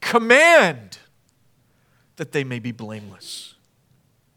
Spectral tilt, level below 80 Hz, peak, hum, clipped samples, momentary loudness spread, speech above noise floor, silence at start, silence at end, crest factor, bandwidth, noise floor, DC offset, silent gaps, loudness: -3.5 dB/octave; -70 dBFS; 0 dBFS; none; under 0.1%; 24 LU; 43 dB; 0 s; 0.95 s; 22 dB; 18.5 kHz; -62 dBFS; under 0.1%; none; -16 LUFS